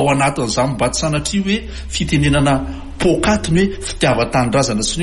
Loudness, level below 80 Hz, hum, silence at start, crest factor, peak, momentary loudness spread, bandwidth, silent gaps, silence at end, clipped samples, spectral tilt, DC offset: -16 LUFS; -30 dBFS; none; 0 s; 14 dB; -2 dBFS; 6 LU; 11.5 kHz; none; 0 s; under 0.1%; -4.5 dB/octave; under 0.1%